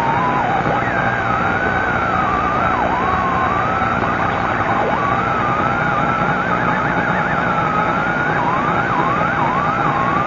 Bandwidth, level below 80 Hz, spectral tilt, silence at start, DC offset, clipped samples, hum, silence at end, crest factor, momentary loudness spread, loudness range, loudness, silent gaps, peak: 7.4 kHz; -38 dBFS; -6.5 dB/octave; 0 s; under 0.1%; under 0.1%; 60 Hz at -30 dBFS; 0 s; 14 dB; 1 LU; 0 LU; -17 LUFS; none; -2 dBFS